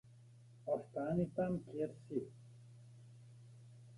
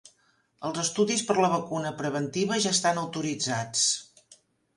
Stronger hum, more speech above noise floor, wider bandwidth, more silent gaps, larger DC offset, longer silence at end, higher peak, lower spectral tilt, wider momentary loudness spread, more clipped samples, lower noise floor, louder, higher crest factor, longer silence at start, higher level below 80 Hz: neither; second, 21 dB vs 40 dB; about the same, 11.5 kHz vs 11.5 kHz; neither; neither; second, 0 s vs 0.45 s; second, -26 dBFS vs -10 dBFS; first, -9.5 dB/octave vs -3 dB/octave; first, 22 LU vs 8 LU; neither; second, -61 dBFS vs -67 dBFS; second, -41 LUFS vs -27 LUFS; about the same, 18 dB vs 18 dB; second, 0.05 s vs 0.6 s; about the same, -70 dBFS vs -70 dBFS